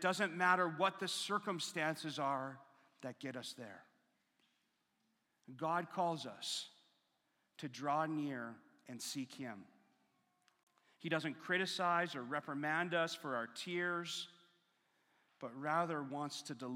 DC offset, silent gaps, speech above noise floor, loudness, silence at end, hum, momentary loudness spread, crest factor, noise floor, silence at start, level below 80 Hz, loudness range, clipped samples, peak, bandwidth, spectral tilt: under 0.1%; 10.63-10.67 s; 42 dB; -40 LUFS; 0 s; none; 16 LU; 24 dB; -82 dBFS; 0 s; under -90 dBFS; 8 LU; under 0.1%; -18 dBFS; 16.5 kHz; -4 dB/octave